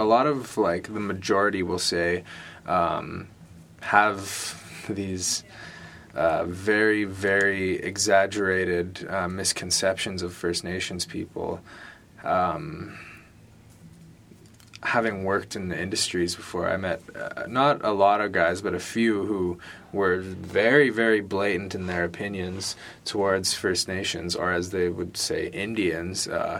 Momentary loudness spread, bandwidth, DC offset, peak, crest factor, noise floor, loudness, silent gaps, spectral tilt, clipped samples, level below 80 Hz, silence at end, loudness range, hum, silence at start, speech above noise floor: 13 LU; 16.5 kHz; under 0.1%; -2 dBFS; 24 dB; -51 dBFS; -25 LUFS; none; -3.5 dB/octave; under 0.1%; -58 dBFS; 0 s; 7 LU; none; 0 s; 26 dB